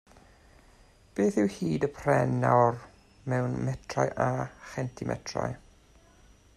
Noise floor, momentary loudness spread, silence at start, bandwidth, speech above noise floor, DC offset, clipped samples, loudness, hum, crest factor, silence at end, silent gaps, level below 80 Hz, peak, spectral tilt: -58 dBFS; 13 LU; 1.15 s; 12 kHz; 30 dB; under 0.1%; under 0.1%; -29 LUFS; none; 20 dB; 1 s; none; -56 dBFS; -10 dBFS; -7 dB/octave